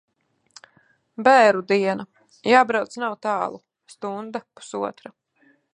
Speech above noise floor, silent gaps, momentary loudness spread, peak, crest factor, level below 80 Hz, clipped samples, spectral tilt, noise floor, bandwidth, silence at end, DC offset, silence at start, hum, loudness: 41 dB; none; 19 LU; -2 dBFS; 22 dB; -76 dBFS; under 0.1%; -4.5 dB/octave; -61 dBFS; 10.5 kHz; 0.85 s; under 0.1%; 1.2 s; none; -21 LUFS